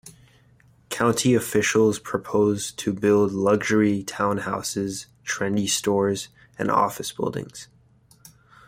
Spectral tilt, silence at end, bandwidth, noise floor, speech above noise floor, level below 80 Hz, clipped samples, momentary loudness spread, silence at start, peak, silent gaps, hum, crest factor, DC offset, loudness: -4.5 dB/octave; 1.05 s; 16 kHz; -57 dBFS; 34 dB; -60 dBFS; under 0.1%; 11 LU; 0.05 s; -8 dBFS; none; none; 16 dB; under 0.1%; -23 LUFS